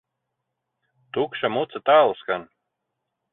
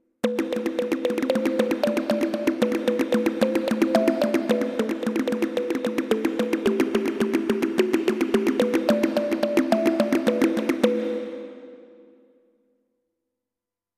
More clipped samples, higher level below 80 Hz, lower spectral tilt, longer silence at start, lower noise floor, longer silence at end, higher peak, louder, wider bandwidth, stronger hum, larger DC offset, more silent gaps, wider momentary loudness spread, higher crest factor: neither; second, -70 dBFS vs -64 dBFS; first, -9 dB/octave vs -5.5 dB/octave; first, 1.15 s vs 0.25 s; second, -80 dBFS vs -89 dBFS; second, 0.9 s vs 2.15 s; about the same, -4 dBFS vs -4 dBFS; about the same, -22 LUFS vs -23 LUFS; second, 4.1 kHz vs 15.5 kHz; neither; neither; neither; first, 12 LU vs 5 LU; about the same, 20 dB vs 20 dB